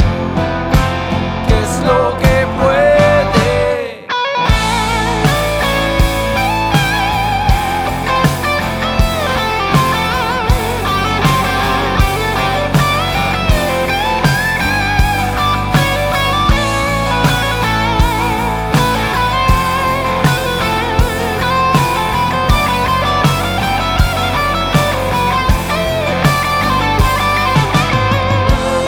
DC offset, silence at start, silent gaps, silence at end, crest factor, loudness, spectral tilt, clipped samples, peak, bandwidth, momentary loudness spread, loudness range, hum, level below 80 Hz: under 0.1%; 0 s; none; 0 s; 14 dB; -13 LUFS; -5 dB/octave; under 0.1%; 0 dBFS; over 20 kHz; 3 LU; 2 LU; none; -22 dBFS